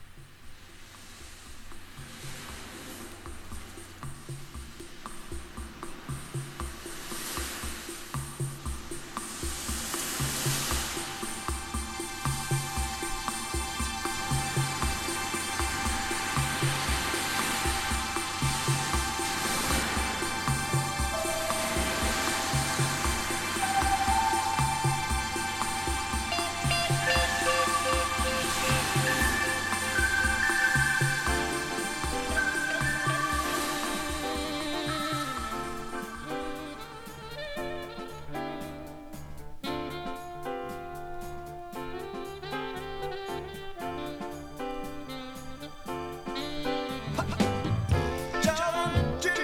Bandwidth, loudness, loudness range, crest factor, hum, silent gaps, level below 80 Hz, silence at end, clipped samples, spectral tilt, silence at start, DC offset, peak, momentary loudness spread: 17 kHz; -30 LUFS; 13 LU; 20 dB; none; none; -42 dBFS; 0 s; under 0.1%; -3 dB/octave; 0 s; under 0.1%; -12 dBFS; 16 LU